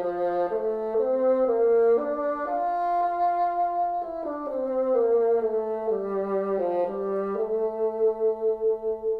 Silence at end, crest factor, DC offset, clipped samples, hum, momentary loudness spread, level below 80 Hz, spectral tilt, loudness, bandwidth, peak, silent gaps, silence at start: 0 s; 12 dB; under 0.1%; under 0.1%; none; 6 LU; -60 dBFS; -9 dB/octave; -25 LUFS; 4.8 kHz; -14 dBFS; none; 0 s